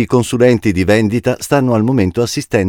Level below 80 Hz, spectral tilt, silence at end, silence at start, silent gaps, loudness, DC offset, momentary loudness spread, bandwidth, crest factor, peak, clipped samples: -40 dBFS; -6 dB/octave; 0 s; 0 s; none; -13 LUFS; under 0.1%; 4 LU; 18 kHz; 12 dB; 0 dBFS; 0.2%